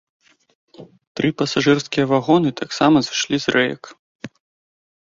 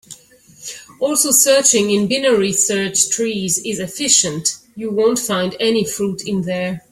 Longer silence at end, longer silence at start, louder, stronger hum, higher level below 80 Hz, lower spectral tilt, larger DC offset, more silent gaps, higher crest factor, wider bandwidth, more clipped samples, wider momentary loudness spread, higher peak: first, 0.8 s vs 0.1 s; first, 0.8 s vs 0.1 s; second, -18 LUFS vs -15 LUFS; neither; about the same, -58 dBFS vs -58 dBFS; first, -5 dB/octave vs -2.5 dB/octave; neither; first, 1.07-1.15 s, 3.99-4.19 s vs none; about the same, 18 dB vs 18 dB; second, 7.6 kHz vs 16.5 kHz; neither; first, 21 LU vs 12 LU; about the same, -2 dBFS vs 0 dBFS